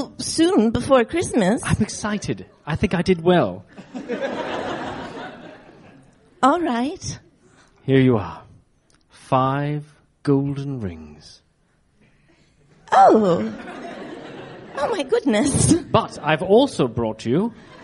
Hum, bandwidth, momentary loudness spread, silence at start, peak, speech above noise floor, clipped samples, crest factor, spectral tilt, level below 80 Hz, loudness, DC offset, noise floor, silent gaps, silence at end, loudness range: none; 11.5 kHz; 18 LU; 0 s; -2 dBFS; 43 dB; under 0.1%; 20 dB; -5.5 dB/octave; -46 dBFS; -20 LUFS; under 0.1%; -62 dBFS; none; 0 s; 6 LU